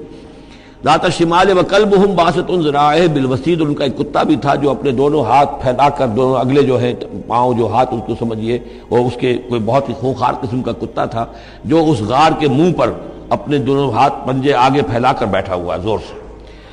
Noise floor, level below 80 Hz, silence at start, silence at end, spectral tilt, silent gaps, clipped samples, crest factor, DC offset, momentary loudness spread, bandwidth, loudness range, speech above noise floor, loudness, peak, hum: -37 dBFS; -38 dBFS; 0 s; 0 s; -6.5 dB/octave; none; under 0.1%; 12 dB; under 0.1%; 9 LU; 10.5 kHz; 4 LU; 24 dB; -14 LUFS; -4 dBFS; none